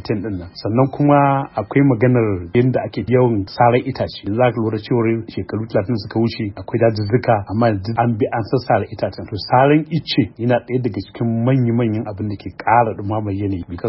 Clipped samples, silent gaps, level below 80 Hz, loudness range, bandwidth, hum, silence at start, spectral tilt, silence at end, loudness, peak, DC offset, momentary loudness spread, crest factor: under 0.1%; none; -48 dBFS; 3 LU; 5.8 kHz; none; 0 s; -11.5 dB/octave; 0 s; -18 LUFS; 0 dBFS; under 0.1%; 10 LU; 16 dB